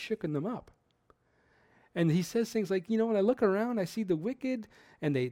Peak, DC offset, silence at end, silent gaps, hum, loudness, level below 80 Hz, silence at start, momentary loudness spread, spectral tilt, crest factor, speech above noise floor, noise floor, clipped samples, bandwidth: -14 dBFS; under 0.1%; 0 s; none; none; -31 LUFS; -70 dBFS; 0 s; 11 LU; -7 dB/octave; 18 dB; 38 dB; -69 dBFS; under 0.1%; 16.5 kHz